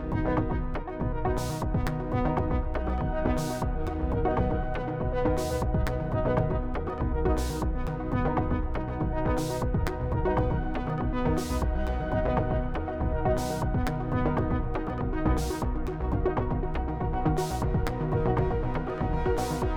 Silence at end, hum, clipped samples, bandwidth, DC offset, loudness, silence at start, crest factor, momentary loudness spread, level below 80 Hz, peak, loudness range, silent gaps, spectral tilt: 0 s; none; under 0.1%; 19.5 kHz; under 0.1%; -29 LUFS; 0 s; 16 dB; 4 LU; -32 dBFS; -12 dBFS; 1 LU; none; -7 dB/octave